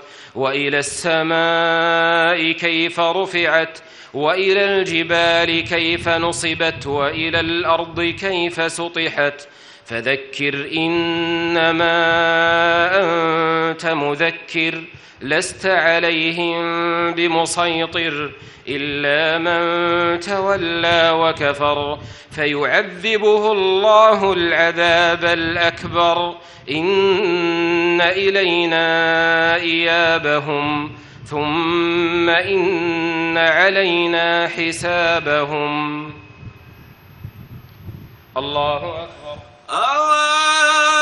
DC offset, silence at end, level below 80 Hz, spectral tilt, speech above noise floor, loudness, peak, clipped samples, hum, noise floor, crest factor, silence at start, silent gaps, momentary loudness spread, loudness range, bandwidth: under 0.1%; 0 s; -52 dBFS; -3.5 dB/octave; 25 dB; -16 LUFS; 0 dBFS; under 0.1%; none; -43 dBFS; 18 dB; 0 s; none; 9 LU; 5 LU; 11.5 kHz